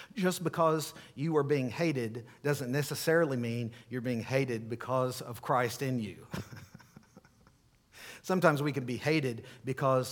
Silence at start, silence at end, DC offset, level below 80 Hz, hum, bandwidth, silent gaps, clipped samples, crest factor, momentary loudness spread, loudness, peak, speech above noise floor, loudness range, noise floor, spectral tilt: 0 s; 0 s; under 0.1%; -70 dBFS; none; 19 kHz; none; under 0.1%; 24 dB; 13 LU; -32 LUFS; -10 dBFS; 33 dB; 5 LU; -65 dBFS; -6 dB/octave